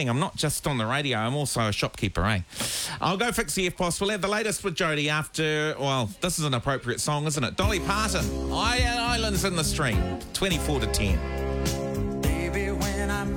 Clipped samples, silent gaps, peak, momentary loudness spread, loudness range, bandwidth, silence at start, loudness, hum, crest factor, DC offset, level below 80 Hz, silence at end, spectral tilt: under 0.1%; none; -12 dBFS; 3 LU; 1 LU; 19 kHz; 0 s; -26 LUFS; none; 14 dB; under 0.1%; -36 dBFS; 0 s; -4 dB/octave